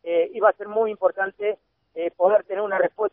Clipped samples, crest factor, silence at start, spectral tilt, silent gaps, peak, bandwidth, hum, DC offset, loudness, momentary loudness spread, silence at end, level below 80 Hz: under 0.1%; 18 dB; 0.05 s; -2.5 dB/octave; none; -4 dBFS; 3.6 kHz; none; under 0.1%; -23 LUFS; 11 LU; 0.05 s; -74 dBFS